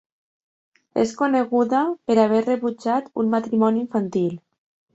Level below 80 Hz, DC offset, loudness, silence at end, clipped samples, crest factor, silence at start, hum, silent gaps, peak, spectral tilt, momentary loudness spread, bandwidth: -66 dBFS; under 0.1%; -21 LUFS; 0.55 s; under 0.1%; 18 dB; 0.95 s; none; none; -4 dBFS; -7 dB/octave; 6 LU; 8 kHz